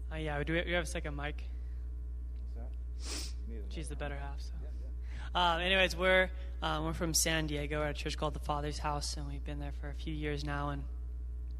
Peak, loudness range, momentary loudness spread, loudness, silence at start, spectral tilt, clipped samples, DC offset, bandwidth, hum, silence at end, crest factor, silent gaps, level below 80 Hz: -14 dBFS; 11 LU; 15 LU; -35 LUFS; 0 s; -3.5 dB/octave; under 0.1%; under 0.1%; 14.5 kHz; none; 0 s; 22 dB; none; -40 dBFS